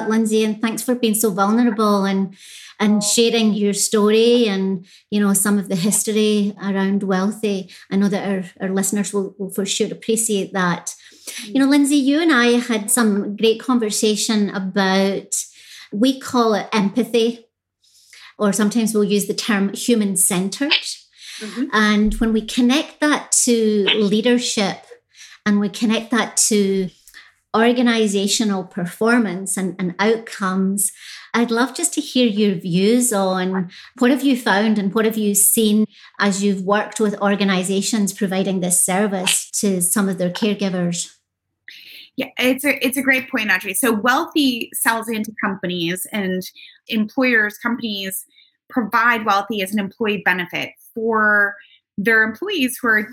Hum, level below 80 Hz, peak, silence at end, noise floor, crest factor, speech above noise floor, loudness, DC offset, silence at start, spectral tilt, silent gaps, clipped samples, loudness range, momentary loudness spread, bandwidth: none; -48 dBFS; -2 dBFS; 0 s; -74 dBFS; 16 dB; 56 dB; -18 LUFS; under 0.1%; 0 s; -3.5 dB/octave; none; under 0.1%; 4 LU; 9 LU; 17 kHz